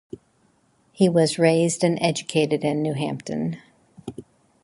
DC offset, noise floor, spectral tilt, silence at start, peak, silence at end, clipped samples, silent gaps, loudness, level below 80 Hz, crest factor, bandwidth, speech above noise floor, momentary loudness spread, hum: under 0.1%; -63 dBFS; -5.5 dB/octave; 1 s; -4 dBFS; 0.45 s; under 0.1%; none; -22 LUFS; -62 dBFS; 20 dB; 11.5 kHz; 42 dB; 20 LU; none